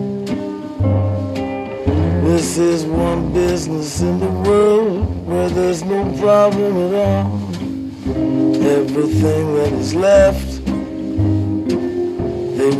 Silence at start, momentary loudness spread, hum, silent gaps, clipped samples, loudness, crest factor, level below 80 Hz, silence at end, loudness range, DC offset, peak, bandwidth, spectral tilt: 0 s; 10 LU; none; none; under 0.1%; -17 LUFS; 14 dB; -32 dBFS; 0 s; 2 LU; under 0.1%; 0 dBFS; 13.5 kHz; -7 dB/octave